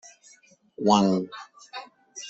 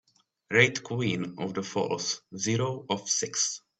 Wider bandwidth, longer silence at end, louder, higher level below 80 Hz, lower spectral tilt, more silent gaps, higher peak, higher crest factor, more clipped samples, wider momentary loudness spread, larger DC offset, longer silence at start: second, 8 kHz vs 9.2 kHz; second, 0 s vs 0.2 s; first, -23 LUFS vs -28 LUFS; about the same, -64 dBFS vs -66 dBFS; first, -5.5 dB/octave vs -3 dB/octave; neither; about the same, -6 dBFS vs -6 dBFS; about the same, 22 dB vs 24 dB; neither; first, 22 LU vs 10 LU; neither; first, 0.8 s vs 0.5 s